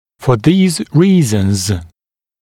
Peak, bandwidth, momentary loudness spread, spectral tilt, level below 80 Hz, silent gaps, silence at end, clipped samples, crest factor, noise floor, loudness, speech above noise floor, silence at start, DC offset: 0 dBFS; 16 kHz; 7 LU; -6 dB/octave; -42 dBFS; none; 0.55 s; under 0.1%; 14 dB; -76 dBFS; -13 LUFS; 64 dB; 0.2 s; under 0.1%